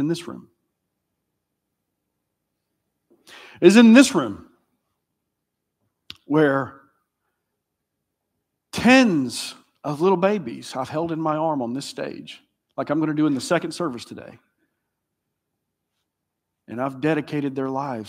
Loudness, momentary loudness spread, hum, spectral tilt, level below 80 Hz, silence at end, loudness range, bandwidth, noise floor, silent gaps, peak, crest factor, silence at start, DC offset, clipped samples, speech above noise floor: -20 LUFS; 21 LU; 60 Hz at -50 dBFS; -5 dB/octave; -66 dBFS; 0 s; 11 LU; 15.5 kHz; -80 dBFS; none; 0 dBFS; 24 dB; 0 s; under 0.1%; under 0.1%; 60 dB